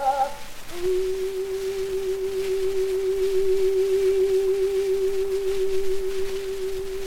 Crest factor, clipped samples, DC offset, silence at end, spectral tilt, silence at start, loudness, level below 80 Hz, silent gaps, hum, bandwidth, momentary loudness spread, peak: 12 dB; under 0.1%; under 0.1%; 0 s; -4.5 dB/octave; 0 s; -25 LUFS; -42 dBFS; none; none; 17 kHz; 8 LU; -10 dBFS